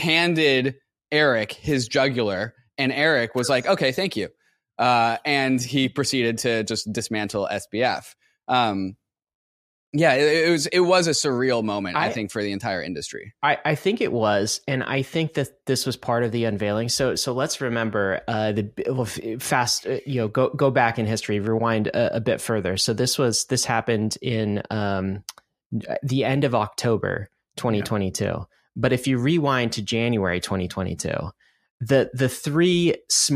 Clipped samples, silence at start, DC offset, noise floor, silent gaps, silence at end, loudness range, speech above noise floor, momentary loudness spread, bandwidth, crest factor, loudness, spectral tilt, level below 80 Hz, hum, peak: under 0.1%; 0 s; under 0.1%; under -90 dBFS; 9.35-9.93 s, 25.66-25.70 s, 31.70-31.78 s; 0 s; 4 LU; over 68 dB; 9 LU; 15.5 kHz; 18 dB; -23 LUFS; -4.5 dB/octave; -56 dBFS; none; -4 dBFS